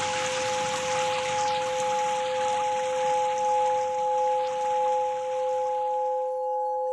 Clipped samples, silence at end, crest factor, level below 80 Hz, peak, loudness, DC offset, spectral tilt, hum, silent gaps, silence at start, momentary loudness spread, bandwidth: under 0.1%; 0 s; 10 dB; -66 dBFS; -16 dBFS; -26 LUFS; under 0.1%; -1.5 dB/octave; none; none; 0 s; 3 LU; 12 kHz